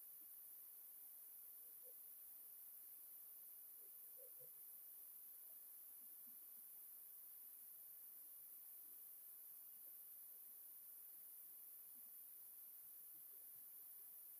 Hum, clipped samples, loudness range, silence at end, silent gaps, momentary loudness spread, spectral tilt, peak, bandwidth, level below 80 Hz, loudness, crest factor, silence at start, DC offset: none; under 0.1%; 0 LU; 0 s; none; 0 LU; 0 dB/octave; -46 dBFS; 15.5 kHz; under -90 dBFS; -57 LUFS; 14 dB; 0 s; under 0.1%